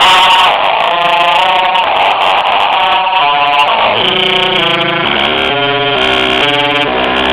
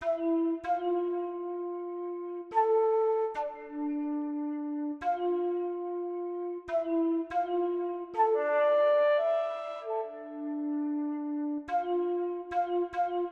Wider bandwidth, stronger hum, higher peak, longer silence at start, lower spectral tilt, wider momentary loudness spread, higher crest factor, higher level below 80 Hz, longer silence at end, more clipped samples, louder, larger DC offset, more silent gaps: first, 17 kHz vs 6.2 kHz; neither; first, 0 dBFS vs -16 dBFS; about the same, 0 s vs 0 s; second, -3 dB/octave vs -6 dB/octave; second, 3 LU vs 11 LU; second, 10 dB vs 16 dB; first, -40 dBFS vs -70 dBFS; about the same, 0 s vs 0 s; first, 0.4% vs under 0.1%; first, -9 LUFS vs -31 LUFS; neither; neither